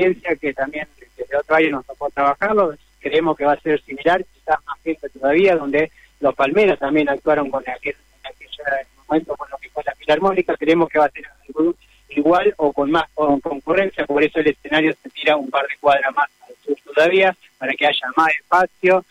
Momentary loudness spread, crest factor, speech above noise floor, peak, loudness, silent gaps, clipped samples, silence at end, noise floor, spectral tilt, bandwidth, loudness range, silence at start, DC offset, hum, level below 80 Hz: 11 LU; 14 dB; 21 dB; -4 dBFS; -19 LUFS; none; under 0.1%; 0.1 s; -39 dBFS; -6 dB/octave; 12 kHz; 2 LU; 0 s; under 0.1%; none; -52 dBFS